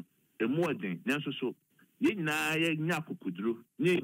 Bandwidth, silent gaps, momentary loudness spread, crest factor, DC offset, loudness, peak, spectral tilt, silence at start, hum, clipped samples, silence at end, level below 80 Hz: 16 kHz; none; 7 LU; 16 dB; under 0.1%; -32 LUFS; -16 dBFS; -5.5 dB/octave; 0 s; none; under 0.1%; 0 s; -78 dBFS